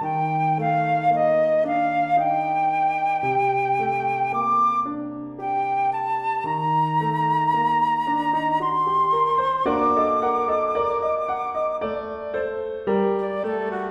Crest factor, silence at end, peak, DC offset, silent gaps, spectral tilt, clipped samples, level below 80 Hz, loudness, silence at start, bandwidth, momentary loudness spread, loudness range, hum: 12 dB; 0 s; -10 dBFS; under 0.1%; none; -7.5 dB/octave; under 0.1%; -58 dBFS; -22 LUFS; 0 s; 11.5 kHz; 7 LU; 3 LU; none